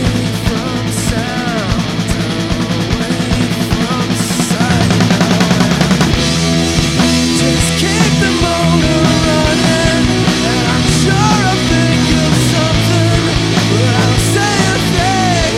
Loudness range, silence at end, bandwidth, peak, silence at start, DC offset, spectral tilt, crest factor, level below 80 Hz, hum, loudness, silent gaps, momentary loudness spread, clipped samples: 4 LU; 0 s; 16 kHz; 0 dBFS; 0 s; under 0.1%; -4.5 dB/octave; 12 dB; -26 dBFS; none; -12 LUFS; none; 5 LU; under 0.1%